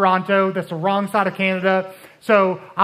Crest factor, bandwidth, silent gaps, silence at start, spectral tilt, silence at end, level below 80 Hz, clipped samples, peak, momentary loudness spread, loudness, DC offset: 18 dB; 15 kHz; none; 0 s; -6.5 dB/octave; 0 s; -70 dBFS; under 0.1%; -2 dBFS; 6 LU; -19 LUFS; under 0.1%